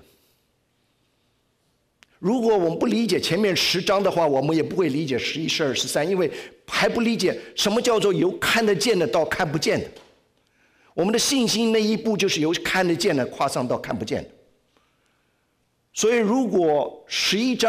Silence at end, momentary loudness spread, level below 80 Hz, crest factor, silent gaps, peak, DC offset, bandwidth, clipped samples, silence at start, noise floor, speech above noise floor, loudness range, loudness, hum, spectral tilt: 0 s; 7 LU; -58 dBFS; 10 dB; none; -12 dBFS; under 0.1%; 16 kHz; under 0.1%; 2.2 s; -69 dBFS; 47 dB; 4 LU; -22 LUFS; none; -4 dB/octave